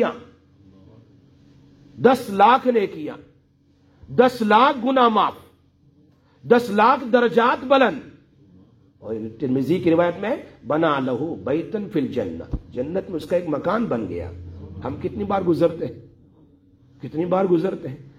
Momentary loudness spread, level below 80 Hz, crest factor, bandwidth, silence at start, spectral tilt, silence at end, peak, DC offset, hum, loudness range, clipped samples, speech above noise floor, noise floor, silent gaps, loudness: 16 LU; -50 dBFS; 20 dB; 15 kHz; 0 s; -7 dB/octave; 0.1 s; -2 dBFS; under 0.1%; none; 7 LU; under 0.1%; 38 dB; -58 dBFS; none; -20 LUFS